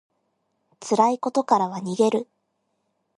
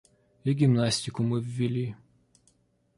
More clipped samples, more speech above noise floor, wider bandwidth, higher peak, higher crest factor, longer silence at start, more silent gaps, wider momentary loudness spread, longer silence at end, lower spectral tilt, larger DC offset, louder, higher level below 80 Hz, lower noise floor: neither; first, 52 dB vs 41 dB; about the same, 11.5 kHz vs 11.5 kHz; first, -4 dBFS vs -12 dBFS; about the same, 22 dB vs 18 dB; first, 0.8 s vs 0.45 s; neither; about the same, 12 LU vs 10 LU; about the same, 0.95 s vs 1 s; about the same, -5.5 dB/octave vs -6 dB/octave; neither; first, -22 LUFS vs -28 LUFS; second, -76 dBFS vs -62 dBFS; first, -74 dBFS vs -67 dBFS